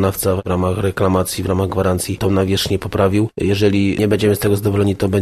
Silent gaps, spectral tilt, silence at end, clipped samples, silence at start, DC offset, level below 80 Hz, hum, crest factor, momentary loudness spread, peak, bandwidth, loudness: none; -6 dB/octave; 0 s; under 0.1%; 0 s; 0.1%; -40 dBFS; none; 14 dB; 4 LU; -2 dBFS; 13.5 kHz; -17 LUFS